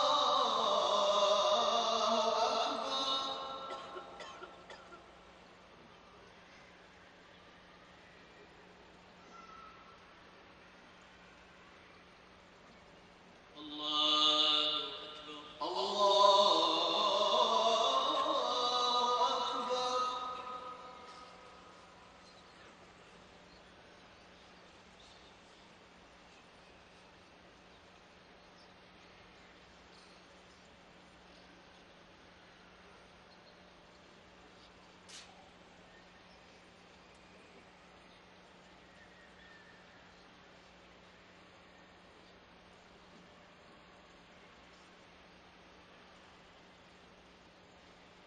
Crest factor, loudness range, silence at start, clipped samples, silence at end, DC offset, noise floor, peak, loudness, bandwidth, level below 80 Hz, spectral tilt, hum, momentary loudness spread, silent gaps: 26 dB; 28 LU; 0 s; under 0.1%; 8.7 s; under 0.1%; -60 dBFS; -12 dBFS; -31 LUFS; 10 kHz; -74 dBFS; -1.5 dB/octave; none; 28 LU; none